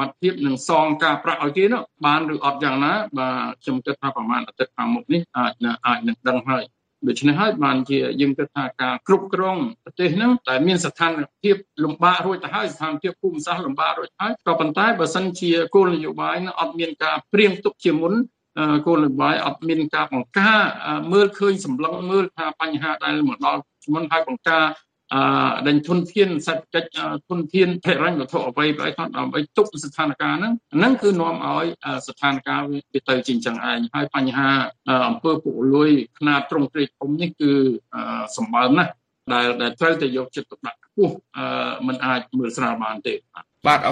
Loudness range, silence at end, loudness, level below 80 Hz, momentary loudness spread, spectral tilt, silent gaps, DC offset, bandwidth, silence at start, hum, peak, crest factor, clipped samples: 3 LU; 0 s; -21 LUFS; -66 dBFS; 8 LU; -5.5 dB/octave; none; under 0.1%; 10 kHz; 0 s; none; 0 dBFS; 20 dB; under 0.1%